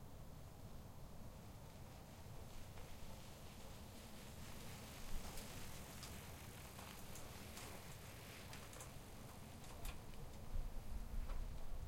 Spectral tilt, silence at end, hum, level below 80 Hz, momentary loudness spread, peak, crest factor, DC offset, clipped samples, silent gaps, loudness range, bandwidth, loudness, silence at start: -4 dB/octave; 0 s; none; -54 dBFS; 6 LU; -34 dBFS; 18 dB; under 0.1%; under 0.1%; none; 4 LU; 16.5 kHz; -55 LUFS; 0 s